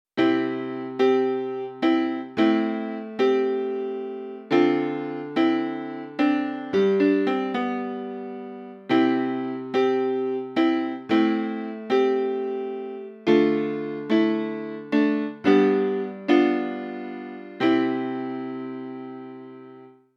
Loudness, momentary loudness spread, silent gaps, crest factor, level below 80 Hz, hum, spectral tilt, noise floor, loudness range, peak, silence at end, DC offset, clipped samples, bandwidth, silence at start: -24 LUFS; 14 LU; none; 18 dB; -74 dBFS; none; -7 dB/octave; -47 dBFS; 3 LU; -6 dBFS; 0.3 s; under 0.1%; under 0.1%; 6.6 kHz; 0.15 s